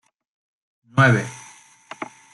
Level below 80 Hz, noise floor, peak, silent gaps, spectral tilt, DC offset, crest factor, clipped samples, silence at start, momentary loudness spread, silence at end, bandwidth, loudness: -62 dBFS; -48 dBFS; -4 dBFS; none; -6 dB/octave; under 0.1%; 20 dB; under 0.1%; 0.95 s; 24 LU; 0.3 s; 11.5 kHz; -18 LUFS